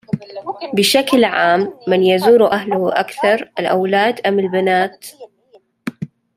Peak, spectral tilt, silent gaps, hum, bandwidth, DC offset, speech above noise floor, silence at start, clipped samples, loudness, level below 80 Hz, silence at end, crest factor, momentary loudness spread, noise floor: -2 dBFS; -4.5 dB/octave; none; none; 16 kHz; under 0.1%; 37 dB; 0.15 s; under 0.1%; -15 LUFS; -62 dBFS; 0.3 s; 14 dB; 16 LU; -52 dBFS